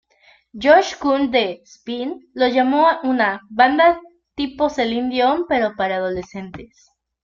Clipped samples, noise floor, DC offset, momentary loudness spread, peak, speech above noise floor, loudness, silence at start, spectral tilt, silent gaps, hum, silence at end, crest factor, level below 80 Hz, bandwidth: under 0.1%; -55 dBFS; under 0.1%; 16 LU; -2 dBFS; 37 dB; -18 LUFS; 0.55 s; -4.5 dB/octave; none; none; 0.6 s; 18 dB; -54 dBFS; 7.4 kHz